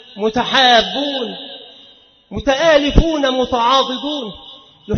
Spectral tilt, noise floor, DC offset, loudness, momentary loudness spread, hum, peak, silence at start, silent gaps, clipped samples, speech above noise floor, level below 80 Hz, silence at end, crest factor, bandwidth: -4.5 dB/octave; -47 dBFS; under 0.1%; -15 LUFS; 19 LU; none; 0 dBFS; 0.15 s; none; under 0.1%; 32 dB; -28 dBFS; 0 s; 16 dB; 6.6 kHz